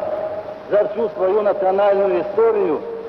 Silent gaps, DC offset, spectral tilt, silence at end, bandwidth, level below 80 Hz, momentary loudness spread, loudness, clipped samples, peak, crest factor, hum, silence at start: none; under 0.1%; -8 dB/octave; 0 s; 5.8 kHz; -60 dBFS; 9 LU; -18 LUFS; under 0.1%; -6 dBFS; 12 dB; none; 0 s